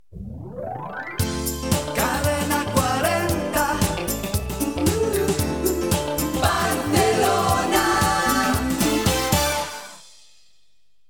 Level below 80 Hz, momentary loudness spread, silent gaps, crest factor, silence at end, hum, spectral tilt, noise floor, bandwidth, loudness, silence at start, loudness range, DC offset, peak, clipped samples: -36 dBFS; 12 LU; none; 20 dB; 1.1 s; none; -4 dB/octave; -69 dBFS; 19 kHz; -21 LUFS; 0.1 s; 3 LU; 0.3%; -4 dBFS; under 0.1%